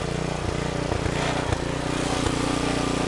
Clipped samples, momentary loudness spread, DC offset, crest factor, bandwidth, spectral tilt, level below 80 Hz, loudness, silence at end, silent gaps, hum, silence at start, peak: under 0.1%; 3 LU; under 0.1%; 16 dB; 11.5 kHz; -5 dB/octave; -36 dBFS; -26 LUFS; 0 s; none; none; 0 s; -8 dBFS